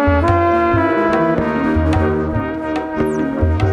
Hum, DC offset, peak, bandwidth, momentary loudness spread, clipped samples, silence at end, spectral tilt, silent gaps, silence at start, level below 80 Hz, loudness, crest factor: none; under 0.1%; -2 dBFS; 9.6 kHz; 7 LU; under 0.1%; 0 s; -8.5 dB/octave; none; 0 s; -28 dBFS; -16 LUFS; 14 dB